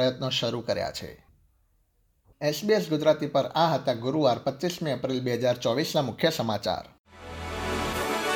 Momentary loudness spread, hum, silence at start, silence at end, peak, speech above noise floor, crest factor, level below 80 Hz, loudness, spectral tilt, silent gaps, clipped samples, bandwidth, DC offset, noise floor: 10 LU; none; 0 s; 0 s; -8 dBFS; 42 dB; 18 dB; -52 dBFS; -27 LUFS; -5 dB/octave; 6.99-7.04 s; under 0.1%; 19 kHz; under 0.1%; -68 dBFS